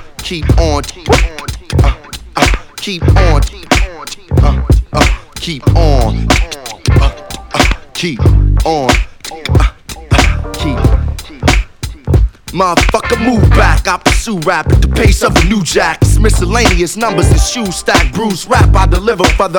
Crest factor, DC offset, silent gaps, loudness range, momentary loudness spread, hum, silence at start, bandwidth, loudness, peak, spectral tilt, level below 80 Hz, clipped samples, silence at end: 10 dB; under 0.1%; none; 3 LU; 9 LU; none; 0 s; 18.5 kHz; -12 LUFS; 0 dBFS; -5 dB/octave; -14 dBFS; 0.6%; 0 s